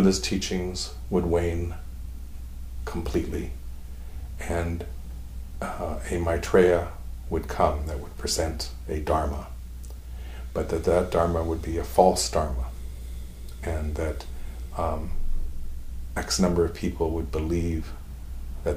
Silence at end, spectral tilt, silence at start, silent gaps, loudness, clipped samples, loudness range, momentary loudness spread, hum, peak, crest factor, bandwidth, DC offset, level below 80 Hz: 0 s; -5.5 dB/octave; 0 s; none; -27 LUFS; under 0.1%; 8 LU; 18 LU; none; -4 dBFS; 24 dB; 15.5 kHz; under 0.1%; -34 dBFS